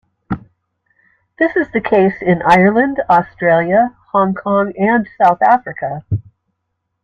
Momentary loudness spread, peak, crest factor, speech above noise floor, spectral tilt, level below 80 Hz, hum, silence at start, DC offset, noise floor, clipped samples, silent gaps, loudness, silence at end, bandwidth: 13 LU; 0 dBFS; 16 dB; 59 dB; -8 dB/octave; -48 dBFS; none; 0.3 s; under 0.1%; -72 dBFS; under 0.1%; none; -14 LUFS; 0.85 s; 8.4 kHz